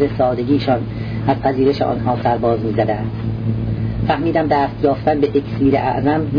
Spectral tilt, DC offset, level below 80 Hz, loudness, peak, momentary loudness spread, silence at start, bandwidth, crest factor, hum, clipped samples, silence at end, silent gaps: -9.5 dB/octave; under 0.1%; -36 dBFS; -18 LUFS; -2 dBFS; 5 LU; 0 s; 5.2 kHz; 14 dB; none; under 0.1%; 0 s; none